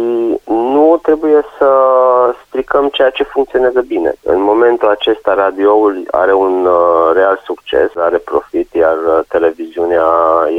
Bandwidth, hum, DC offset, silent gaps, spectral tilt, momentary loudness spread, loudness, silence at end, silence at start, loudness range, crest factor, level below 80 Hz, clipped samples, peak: 5 kHz; none; under 0.1%; none; -6 dB/octave; 6 LU; -12 LUFS; 0 s; 0 s; 2 LU; 12 dB; -46 dBFS; under 0.1%; 0 dBFS